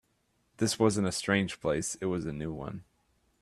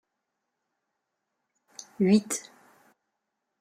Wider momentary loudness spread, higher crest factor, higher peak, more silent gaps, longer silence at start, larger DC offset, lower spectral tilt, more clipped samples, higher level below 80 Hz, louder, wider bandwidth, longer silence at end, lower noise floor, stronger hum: second, 12 LU vs 24 LU; about the same, 20 dB vs 22 dB; about the same, -12 dBFS vs -10 dBFS; neither; second, 0.6 s vs 2 s; neither; about the same, -4.5 dB/octave vs -5.5 dB/octave; neither; first, -58 dBFS vs -72 dBFS; second, -31 LUFS vs -26 LUFS; second, 13.5 kHz vs 15 kHz; second, 0.6 s vs 1.2 s; second, -74 dBFS vs -83 dBFS; neither